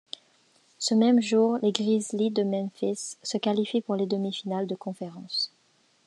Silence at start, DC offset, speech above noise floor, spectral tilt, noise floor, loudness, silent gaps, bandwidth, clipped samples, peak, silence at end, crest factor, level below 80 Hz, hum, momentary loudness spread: 0.8 s; under 0.1%; 40 dB; -5 dB/octave; -66 dBFS; -27 LUFS; none; 11 kHz; under 0.1%; -6 dBFS; 0.6 s; 20 dB; -84 dBFS; none; 12 LU